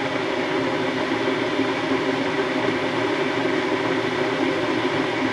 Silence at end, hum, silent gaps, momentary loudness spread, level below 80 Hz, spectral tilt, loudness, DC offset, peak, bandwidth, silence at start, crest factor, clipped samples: 0 s; none; none; 1 LU; -58 dBFS; -5 dB/octave; -22 LUFS; under 0.1%; -10 dBFS; 12 kHz; 0 s; 14 dB; under 0.1%